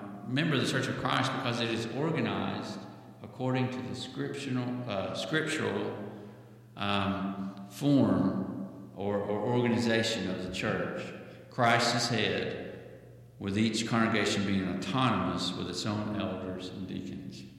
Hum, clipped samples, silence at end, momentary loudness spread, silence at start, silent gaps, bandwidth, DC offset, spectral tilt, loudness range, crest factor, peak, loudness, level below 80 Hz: none; under 0.1%; 0 s; 14 LU; 0 s; none; 15.5 kHz; under 0.1%; -5 dB/octave; 4 LU; 20 dB; -12 dBFS; -31 LUFS; -66 dBFS